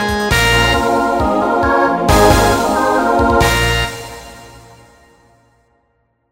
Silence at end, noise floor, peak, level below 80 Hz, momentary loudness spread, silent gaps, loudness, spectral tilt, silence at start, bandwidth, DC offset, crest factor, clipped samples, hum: 1.75 s; -62 dBFS; 0 dBFS; -26 dBFS; 7 LU; none; -13 LUFS; -4.5 dB/octave; 0 s; 16.5 kHz; under 0.1%; 14 dB; under 0.1%; none